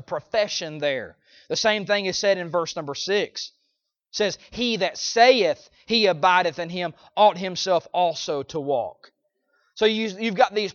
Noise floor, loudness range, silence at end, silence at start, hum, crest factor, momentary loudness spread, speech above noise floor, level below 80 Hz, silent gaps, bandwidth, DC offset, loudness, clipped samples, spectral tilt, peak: -75 dBFS; 5 LU; 0 s; 0.1 s; none; 20 dB; 11 LU; 52 dB; -64 dBFS; none; 7.4 kHz; under 0.1%; -23 LUFS; under 0.1%; -3 dB/octave; -4 dBFS